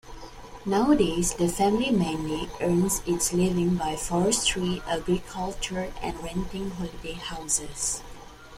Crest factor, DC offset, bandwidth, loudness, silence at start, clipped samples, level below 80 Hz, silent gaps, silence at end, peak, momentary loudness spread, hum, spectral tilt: 18 dB; under 0.1%; 16 kHz; -26 LUFS; 0.05 s; under 0.1%; -42 dBFS; none; 0 s; -10 dBFS; 13 LU; none; -4 dB/octave